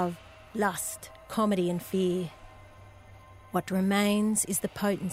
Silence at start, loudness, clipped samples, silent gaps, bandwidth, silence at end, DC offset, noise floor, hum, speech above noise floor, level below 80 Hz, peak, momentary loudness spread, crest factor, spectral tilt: 0 s; -29 LUFS; under 0.1%; none; 16 kHz; 0 s; under 0.1%; -51 dBFS; none; 23 dB; -58 dBFS; -12 dBFS; 11 LU; 18 dB; -4.5 dB/octave